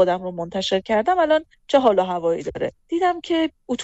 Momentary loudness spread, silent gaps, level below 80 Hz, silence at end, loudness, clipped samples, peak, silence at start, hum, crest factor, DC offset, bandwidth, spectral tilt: 8 LU; none; -54 dBFS; 0 s; -21 LUFS; under 0.1%; -6 dBFS; 0 s; none; 16 dB; under 0.1%; 8.2 kHz; -5 dB/octave